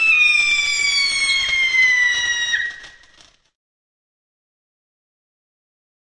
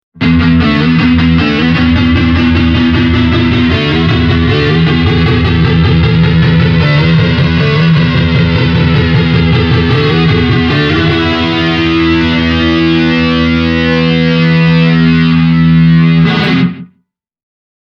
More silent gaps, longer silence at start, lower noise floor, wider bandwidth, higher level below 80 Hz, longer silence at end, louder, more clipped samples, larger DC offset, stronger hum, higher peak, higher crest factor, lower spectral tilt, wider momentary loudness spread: neither; second, 0 s vs 0.15 s; second, -52 dBFS vs -60 dBFS; first, 11.5 kHz vs 6.4 kHz; second, -54 dBFS vs -22 dBFS; first, 3.15 s vs 1.05 s; second, -15 LUFS vs -9 LUFS; neither; neither; neither; second, -6 dBFS vs 0 dBFS; first, 16 dB vs 8 dB; second, 3 dB/octave vs -8 dB/octave; first, 7 LU vs 2 LU